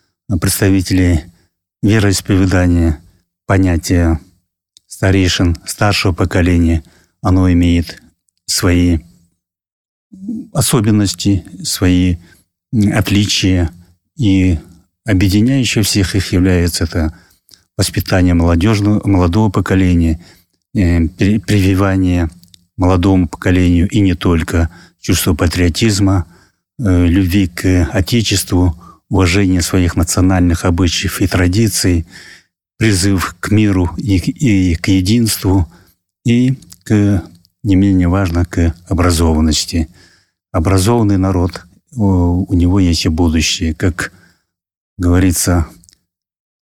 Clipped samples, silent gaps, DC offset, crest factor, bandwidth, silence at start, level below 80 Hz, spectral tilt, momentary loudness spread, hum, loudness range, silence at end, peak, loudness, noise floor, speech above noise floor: under 0.1%; 9.72-10.10 s, 44.77-44.96 s; 0.7%; 12 dB; 17.5 kHz; 0.3 s; -28 dBFS; -5.5 dB/octave; 8 LU; none; 2 LU; 0.95 s; 0 dBFS; -13 LUFS; -62 dBFS; 50 dB